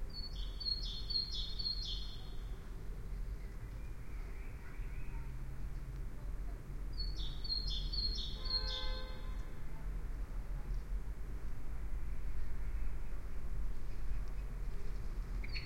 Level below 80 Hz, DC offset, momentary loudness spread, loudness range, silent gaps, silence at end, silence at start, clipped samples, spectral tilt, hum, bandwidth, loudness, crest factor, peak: -42 dBFS; under 0.1%; 12 LU; 8 LU; none; 0 s; 0 s; under 0.1%; -4.5 dB/octave; none; 11 kHz; -44 LUFS; 12 dB; -26 dBFS